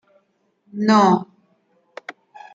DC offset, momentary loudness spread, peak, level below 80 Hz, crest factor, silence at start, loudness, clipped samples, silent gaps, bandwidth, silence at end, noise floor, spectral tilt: under 0.1%; 23 LU; -4 dBFS; -72 dBFS; 18 dB; 0.75 s; -17 LUFS; under 0.1%; none; 7.8 kHz; 0.45 s; -66 dBFS; -6 dB/octave